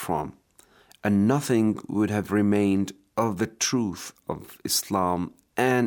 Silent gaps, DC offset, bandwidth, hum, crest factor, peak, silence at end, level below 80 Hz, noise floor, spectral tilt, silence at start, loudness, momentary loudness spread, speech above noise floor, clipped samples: none; under 0.1%; 19.5 kHz; none; 16 dB; -8 dBFS; 0 s; -62 dBFS; -58 dBFS; -5 dB/octave; 0 s; -25 LUFS; 13 LU; 33 dB; under 0.1%